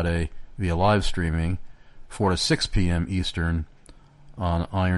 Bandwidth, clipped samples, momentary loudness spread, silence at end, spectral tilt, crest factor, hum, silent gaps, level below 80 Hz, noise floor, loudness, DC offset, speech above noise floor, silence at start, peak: 11.5 kHz; under 0.1%; 10 LU; 0 s; -5.5 dB/octave; 16 dB; none; none; -34 dBFS; -49 dBFS; -25 LUFS; under 0.1%; 26 dB; 0 s; -8 dBFS